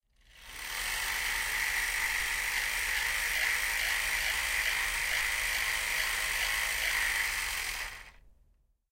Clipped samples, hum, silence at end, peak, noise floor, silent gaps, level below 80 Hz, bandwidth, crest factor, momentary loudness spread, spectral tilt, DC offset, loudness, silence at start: under 0.1%; none; 0.6 s; -16 dBFS; -68 dBFS; none; -50 dBFS; 16 kHz; 16 dB; 6 LU; 1 dB/octave; under 0.1%; -29 LUFS; 0.35 s